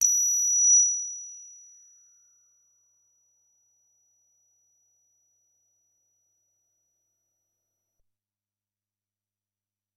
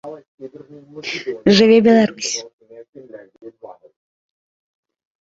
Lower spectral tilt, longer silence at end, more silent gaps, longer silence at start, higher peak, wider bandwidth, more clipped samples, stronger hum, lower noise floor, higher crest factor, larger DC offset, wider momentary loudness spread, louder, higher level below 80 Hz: second, 6 dB/octave vs -4.5 dB/octave; first, 8.5 s vs 1.5 s; second, none vs 0.28-0.38 s, 2.53-2.59 s, 2.89-2.93 s; about the same, 0 s vs 0.05 s; second, -8 dBFS vs -2 dBFS; first, 12 kHz vs 8 kHz; neither; neither; first, under -90 dBFS vs -39 dBFS; about the same, 22 dB vs 18 dB; neither; about the same, 26 LU vs 26 LU; second, -20 LUFS vs -15 LUFS; second, -88 dBFS vs -58 dBFS